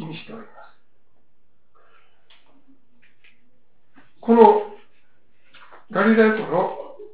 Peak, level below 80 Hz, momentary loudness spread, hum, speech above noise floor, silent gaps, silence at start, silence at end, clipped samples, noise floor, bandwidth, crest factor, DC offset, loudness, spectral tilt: 0 dBFS; -66 dBFS; 23 LU; none; 51 dB; none; 0 s; 0.1 s; under 0.1%; -68 dBFS; 4 kHz; 22 dB; 0.8%; -18 LUFS; -10 dB/octave